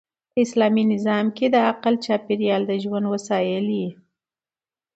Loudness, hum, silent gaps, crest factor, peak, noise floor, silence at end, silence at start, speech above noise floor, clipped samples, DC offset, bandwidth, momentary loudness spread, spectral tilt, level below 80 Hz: -21 LUFS; none; none; 16 dB; -6 dBFS; under -90 dBFS; 1 s; 0.35 s; over 69 dB; under 0.1%; under 0.1%; 8.2 kHz; 6 LU; -6 dB/octave; -68 dBFS